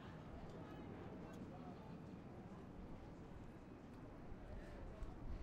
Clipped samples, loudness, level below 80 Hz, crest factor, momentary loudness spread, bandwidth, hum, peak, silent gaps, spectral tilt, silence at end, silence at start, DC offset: under 0.1%; -56 LUFS; -58 dBFS; 16 dB; 3 LU; 14.5 kHz; none; -38 dBFS; none; -7.5 dB/octave; 0 s; 0 s; under 0.1%